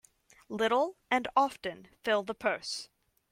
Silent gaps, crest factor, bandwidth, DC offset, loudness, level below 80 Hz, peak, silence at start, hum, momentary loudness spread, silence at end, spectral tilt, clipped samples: none; 20 dB; 16.5 kHz; under 0.1%; -31 LUFS; -70 dBFS; -12 dBFS; 0.5 s; none; 12 LU; 0.45 s; -3 dB/octave; under 0.1%